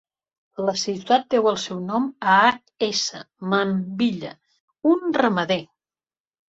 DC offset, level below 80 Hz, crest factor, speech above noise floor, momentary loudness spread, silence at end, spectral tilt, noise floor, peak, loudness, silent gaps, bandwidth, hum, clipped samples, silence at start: under 0.1%; -66 dBFS; 20 dB; over 69 dB; 10 LU; 0.85 s; -4.5 dB/octave; under -90 dBFS; -4 dBFS; -22 LUFS; 4.60-4.68 s; 8 kHz; none; under 0.1%; 0.6 s